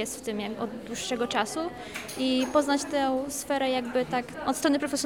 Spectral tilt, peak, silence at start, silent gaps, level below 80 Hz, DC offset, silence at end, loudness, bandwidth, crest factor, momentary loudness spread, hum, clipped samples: -3 dB/octave; -10 dBFS; 0 s; none; -60 dBFS; under 0.1%; 0 s; -28 LUFS; 19.5 kHz; 18 dB; 9 LU; none; under 0.1%